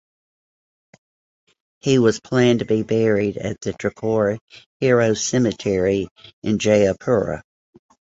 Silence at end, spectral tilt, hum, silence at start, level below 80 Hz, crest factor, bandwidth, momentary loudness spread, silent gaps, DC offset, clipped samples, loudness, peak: 0.7 s; -5.5 dB/octave; none; 1.85 s; -50 dBFS; 18 dB; 8 kHz; 10 LU; 4.41-4.48 s, 4.66-4.80 s, 6.11-6.16 s, 6.33-6.42 s; under 0.1%; under 0.1%; -20 LUFS; -2 dBFS